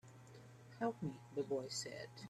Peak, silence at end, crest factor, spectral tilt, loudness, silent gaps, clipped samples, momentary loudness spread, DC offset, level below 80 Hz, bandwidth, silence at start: -28 dBFS; 0 s; 18 dB; -4.5 dB/octave; -44 LUFS; none; under 0.1%; 18 LU; under 0.1%; -80 dBFS; 14 kHz; 0.05 s